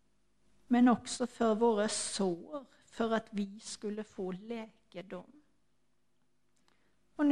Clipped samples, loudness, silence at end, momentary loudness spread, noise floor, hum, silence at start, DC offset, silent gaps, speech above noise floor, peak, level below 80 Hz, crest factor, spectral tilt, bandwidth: under 0.1%; -33 LUFS; 0 s; 20 LU; -80 dBFS; none; 0.7 s; under 0.1%; none; 46 dB; -16 dBFS; -72 dBFS; 20 dB; -4.5 dB/octave; 11.5 kHz